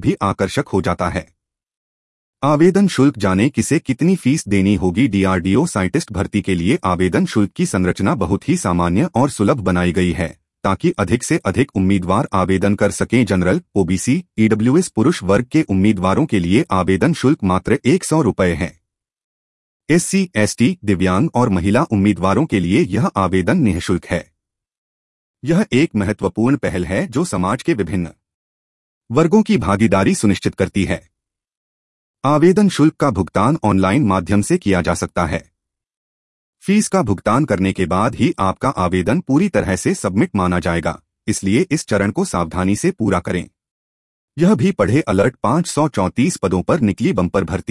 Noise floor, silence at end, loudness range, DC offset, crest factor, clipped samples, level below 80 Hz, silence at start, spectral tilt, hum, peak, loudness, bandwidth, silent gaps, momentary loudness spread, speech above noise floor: -73 dBFS; 0.1 s; 3 LU; under 0.1%; 16 dB; under 0.1%; -44 dBFS; 0 s; -6 dB/octave; none; 0 dBFS; -17 LUFS; 12 kHz; 1.77-2.33 s, 19.24-19.80 s, 24.78-25.34 s, 28.34-29.01 s, 31.57-32.14 s, 35.97-36.53 s, 43.71-44.28 s; 5 LU; 58 dB